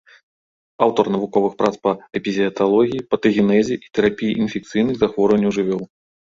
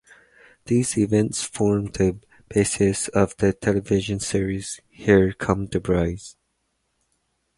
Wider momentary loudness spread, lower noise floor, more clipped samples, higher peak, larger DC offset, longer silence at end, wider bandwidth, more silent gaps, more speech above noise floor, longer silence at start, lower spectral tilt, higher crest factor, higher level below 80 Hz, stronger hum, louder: second, 6 LU vs 9 LU; first, under -90 dBFS vs -73 dBFS; neither; about the same, -2 dBFS vs -4 dBFS; neither; second, 0.45 s vs 1.25 s; second, 7.6 kHz vs 11.5 kHz; neither; first, over 72 dB vs 51 dB; first, 0.8 s vs 0.65 s; about the same, -6.5 dB/octave vs -5.5 dB/octave; about the same, 18 dB vs 20 dB; second, -54 dBFS vs -42 dBFS; neither; first, -19 LUFS vs -22 LUFS